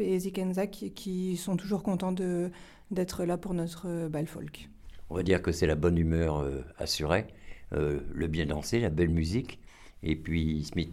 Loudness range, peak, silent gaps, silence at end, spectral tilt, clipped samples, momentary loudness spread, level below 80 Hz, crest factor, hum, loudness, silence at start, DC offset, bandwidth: 3 LU; -12 dBFS; none; 0 s; -6 dB/octave; under 0.1%; 10 LU; -44 dBFS; 20 dB; none; -31 LUFS; 0 s; under 0.1%; 15.5 kHz